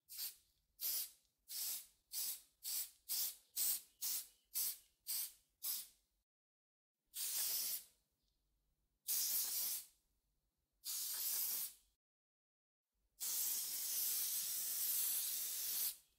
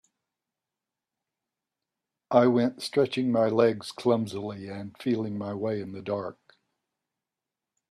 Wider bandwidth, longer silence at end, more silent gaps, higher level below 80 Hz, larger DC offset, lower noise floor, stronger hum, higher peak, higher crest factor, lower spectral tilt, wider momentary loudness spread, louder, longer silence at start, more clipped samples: first, 16 kHz vs 13 kHz; second, 0.2 s vs 1.6 s; first, 6.23-6.95 s, 11.96-12.85 s vs none; second, -88 dBFS vs -72 dBFS; neither; about the same, -87 dBFS vs -89 dBFS; neither; second, -24 dBFS vs -6 dBFS; about the same, 22 dB vs 24 dB; second, 3.5 dB/octave vs -6.5 dB/octave; about the same, 11 LU vs 13 LU; second, -40 LUFS vs -27 LUFS; second, 0.1 s vs 2.3 s; neither